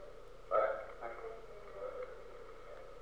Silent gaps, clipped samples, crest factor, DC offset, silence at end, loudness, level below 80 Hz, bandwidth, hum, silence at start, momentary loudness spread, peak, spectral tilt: none; under 0.1%; 22 dB; 0.2%; 0 s; -41 LUFS; -60 dBFS; 11 kHz; none; 0 s; 19 LU; -20 dBFS; -5 dB/octave